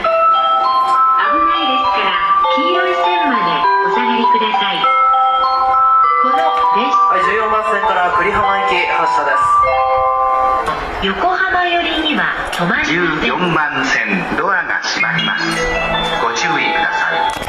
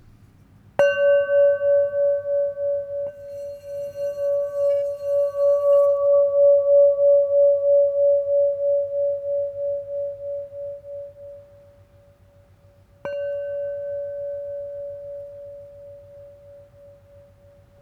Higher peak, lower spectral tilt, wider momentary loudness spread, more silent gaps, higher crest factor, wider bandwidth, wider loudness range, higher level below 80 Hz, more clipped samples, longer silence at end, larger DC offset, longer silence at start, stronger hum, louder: about the same, -4 dBFS vs -6 dBFS; second, -3.5 dB/octave vs -5 dB/octave; second, 4 LU vs 19 LU; neither; second, 10 dB vs 16 dB; first, 14 kHz vs 6.2 kHz; second, 3 LU vs 18 LU; first, -40 dBFS vs -62 dBFS; neither; second, 0 s vs 1.2 s; neither; second, 0 s vs 0.8 s; neither; first, -13 LUFS vs -21 LUFS